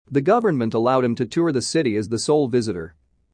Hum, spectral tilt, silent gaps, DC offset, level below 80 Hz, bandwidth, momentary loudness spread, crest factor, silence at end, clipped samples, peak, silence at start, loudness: none; -5.5 dB/octave; none; under 0.1%; -58 dBFS; 10.5 kHz; 6 LU; 14 dB; 0.45 s; under 0.1%; -6 dBFS; 0.1 s; -20 LUFS